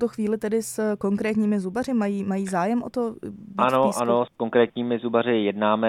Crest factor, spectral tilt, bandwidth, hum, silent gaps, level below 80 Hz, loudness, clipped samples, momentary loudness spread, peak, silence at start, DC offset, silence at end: 18 dB; -6 dB/octave; 15.5 kHz; none; none; -64 dBFS; -24 LUFS; under 0.1%; 5 LU; -6 dBFS; 0 s; under 0.1%; 0 s